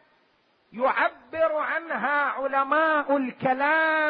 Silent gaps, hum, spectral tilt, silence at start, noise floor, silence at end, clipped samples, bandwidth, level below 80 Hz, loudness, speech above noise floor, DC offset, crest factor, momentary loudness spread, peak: none; none; -8.5 dB/octave; 0.75 s; -65 dBFS; 0 s; under 0.1%; 5.2 kHz; -72 dBFS; -24 LUFS; 41 dB; under 0.1%; 16 dB; 6 LU; -10 dBFS